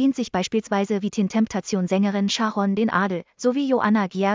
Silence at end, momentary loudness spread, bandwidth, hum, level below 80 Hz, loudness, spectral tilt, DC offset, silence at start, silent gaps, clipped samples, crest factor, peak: 0 s; 3 LU; 7.6 kHz; none; -60 dBFS; -22 LUFS; -5.5 dB/octave; under 0.1%; 0 s; none; under 0.1%; 14 dB; -8 dBFS